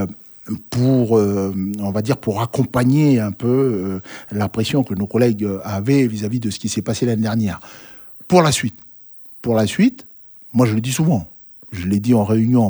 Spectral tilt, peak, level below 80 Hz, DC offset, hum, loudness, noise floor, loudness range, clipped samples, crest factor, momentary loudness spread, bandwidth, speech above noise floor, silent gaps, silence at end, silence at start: -6.5 dB/octave; -2 dBFS; -52 dBFS; under 0.1%; none; -18 LUFS; -41 dBFS; 2 LU; under 0.1%; 18 dB; 21 LU; over 20 kHz; 23 dB; none; 0 s; 0 s